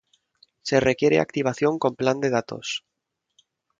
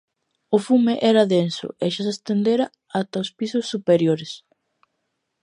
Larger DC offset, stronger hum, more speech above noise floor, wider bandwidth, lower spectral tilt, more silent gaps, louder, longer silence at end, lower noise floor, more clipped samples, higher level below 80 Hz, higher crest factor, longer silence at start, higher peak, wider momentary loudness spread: neither; neither; about the same, 58 dB vs 55 dB; second, 7.8 kHz vs 11 kHz; about the same, -5 dB/octave vs -6 dB/octave; neither; about the same, -23 LUFS vs -21 LUFS; about the same, 1 s vs 1.05 s; first, -81 dBFS vs -76 dBFS; neither; first, -58 dBFS vs -70 dBFS; about the same, 20 dB vs 18 dB; first, 0.65 s vs 0.5 s; about the same, -4 dBFS vs -4 dBFS; about the same, 11 LU vs 9 LU